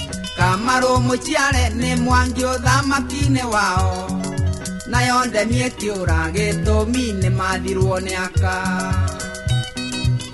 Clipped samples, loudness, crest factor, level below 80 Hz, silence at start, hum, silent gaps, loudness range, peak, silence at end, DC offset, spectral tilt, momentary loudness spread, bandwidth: under 0.1%; -19 LUFS; 16 dB; -28 dBFS; 0 s; none; none; 3 LU; -4 dBFS; 0 s; under 0.1%; -5 dB/octave; 6 LU; 12 kHz